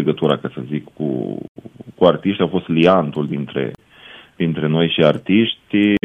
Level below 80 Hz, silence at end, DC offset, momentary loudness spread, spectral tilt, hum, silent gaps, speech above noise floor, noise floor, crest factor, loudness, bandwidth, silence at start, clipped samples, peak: -54 dBFS; 0.1 s; under 0.1%; 13 LU; -8.5 dB/octave; none; 1.48-1.55 s; 25 dB; -43 dBFS; 18 dB; -18 LUFS; 8.2 kHz; 0 s; under 0.1%; 0 dBFS